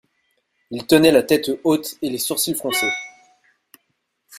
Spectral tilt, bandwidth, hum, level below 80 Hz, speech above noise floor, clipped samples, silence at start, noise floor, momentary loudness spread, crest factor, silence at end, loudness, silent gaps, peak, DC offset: -3.5 dB/octave; 16 kHz; none; -58 dBFS; 53 dB; under 0.1%; 0.7 s; -72 dBFS; 16 LU; 20 dB; 0 s; -18 LUFS; none; 0 dBFS; under 0.1%